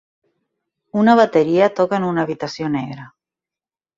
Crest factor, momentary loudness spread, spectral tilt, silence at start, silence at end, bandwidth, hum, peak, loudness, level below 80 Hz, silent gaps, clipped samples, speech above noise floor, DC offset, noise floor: 18 dB; 12 LU; -7 dB/octave; 0.95 s; 0.9 s; 7.6 kHz; none; -2 dBFS; -17 LUFS; -62 dBFS; none; under 0.1%; over 74 dB; under 0.1%; under -90 dBFS